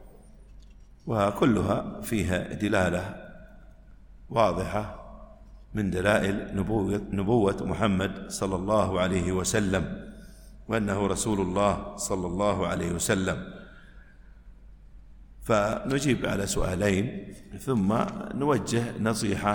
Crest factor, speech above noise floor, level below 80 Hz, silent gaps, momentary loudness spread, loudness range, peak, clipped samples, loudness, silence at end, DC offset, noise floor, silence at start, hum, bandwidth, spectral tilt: 20 dB; 23 dB; -46 dBFS; none; 13 LU; 4 LU; -8 dBFS; under 0.1%; -27 LUFS; 0 s; under 0.1%; -50 dBFS; 0 s; none; 17.5 kHz; -5.5 dB/octave